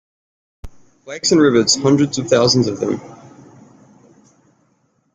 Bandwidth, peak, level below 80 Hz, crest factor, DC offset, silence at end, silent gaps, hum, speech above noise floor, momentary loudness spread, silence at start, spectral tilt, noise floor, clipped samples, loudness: 9.6 kHz; -2 dBFS; -48 dBFS; 18 dB; under 0.1%; 2 s; none; none; 47 dB; 10 LU; 0.65 s; -4.5 dB/octave; -62 dBFS; under 0.1%; -15 LUFS